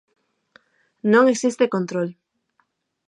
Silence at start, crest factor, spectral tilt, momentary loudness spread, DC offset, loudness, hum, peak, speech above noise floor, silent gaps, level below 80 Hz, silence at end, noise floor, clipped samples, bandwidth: 1.05 s; 18 dB; -5.5 dB/octave; 11 LU; under 0.1%; -20 LUFS; none; -4 dBFS; 50 dB; none; -78 dBFS; 0.95 s; -69 dBFS; under 0.1%; 11 kHz